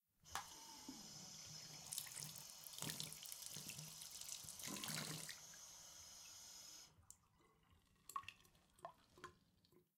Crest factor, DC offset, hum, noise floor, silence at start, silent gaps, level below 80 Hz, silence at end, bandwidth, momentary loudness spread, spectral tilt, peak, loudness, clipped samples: 32 dB; under 0.1%; none; -76 dBFS; 0.25 s; none; -82 dBFS; 0.15 s; 17.5 kHz; 14 LU; -1.5 dB/octave; -24 dBFS; -52 LUFS; under 0.1%